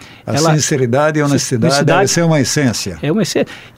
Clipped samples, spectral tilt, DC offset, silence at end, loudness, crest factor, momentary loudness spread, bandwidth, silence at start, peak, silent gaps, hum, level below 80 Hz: under 0.1%; -4.5 dB/octave; under 0.1%; 0.1 s; -14 LUFS; 12 dB; 6 LU; 16 kHz; 0 s; -2 dBFS; none; none; -46 dBFS